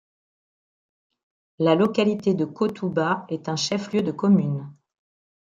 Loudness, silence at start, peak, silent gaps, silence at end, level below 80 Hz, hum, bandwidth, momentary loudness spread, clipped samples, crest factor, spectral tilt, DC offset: -23 LUFS; 1.6 s; -6 dBFS; none; 0.7 s; -68 dBFS; none; 7.6 kHz; 8 LU; under 0.1%; 20 dB; -6 dB/octave; under 0.1%